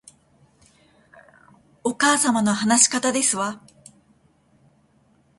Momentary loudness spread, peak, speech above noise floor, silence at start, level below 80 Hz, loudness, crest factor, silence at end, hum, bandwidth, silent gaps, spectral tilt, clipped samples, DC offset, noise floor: 13 LU; -2 dBFS; 40 dB; 1.85 s; -66 dBFS; -19 LUFS; 22 dB; 1.8 s; none; 12 kHz; none; -2 dB/octave; under 0.1%; under 0.1%; -60 dBFS